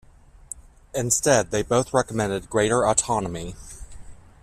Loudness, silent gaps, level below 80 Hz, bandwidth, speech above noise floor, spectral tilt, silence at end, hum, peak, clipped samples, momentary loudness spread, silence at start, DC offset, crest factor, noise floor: -22 LUFS; none; -46 dBFS; 15.5 kHz; 21 dB; -4 dB/octave; 0.25 s; none; -4 dBFS; under 0.1%; 20 LU; 0.55 s; under 0.1%; 20 dB; -43 dBFS